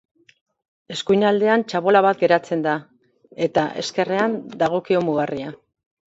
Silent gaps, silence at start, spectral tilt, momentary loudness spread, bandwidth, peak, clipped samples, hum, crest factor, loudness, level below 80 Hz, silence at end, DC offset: none; 0.9 s; -5.5 dB/octave; 11 LU; 8 kHz; -2 dBFS; under 0.1%; none; 18 dB; -20 LUFS; -62 dBFS; 0.6 s; under 0.1%